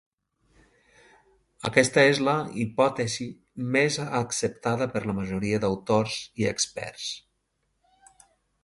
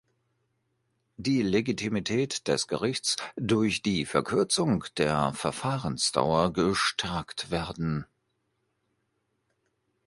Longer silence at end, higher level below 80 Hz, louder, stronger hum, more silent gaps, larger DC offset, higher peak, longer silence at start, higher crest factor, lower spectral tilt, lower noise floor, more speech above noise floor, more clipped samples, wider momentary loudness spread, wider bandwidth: second, 1.45 s vs 2 s; about the same, -58 dBFS vs -54 dBFS; about the same, -26 LUFS vs -28 LUFS; neither; neither; neither; first, -2 dBFS vs -6 dBFS; first, 1.6 s vs 1.2 s; about the same, 24 dB vs 22 dB; about the same, -4 dB/octave vs -4.5 dB/octave; about the same, -75 dBFS vs -77 dBFS; about the same, 49 dB vs 49 dB; neither; first, 13 LU vs 7 LU; about the same, 11.5 kHz vs 11.5 kHz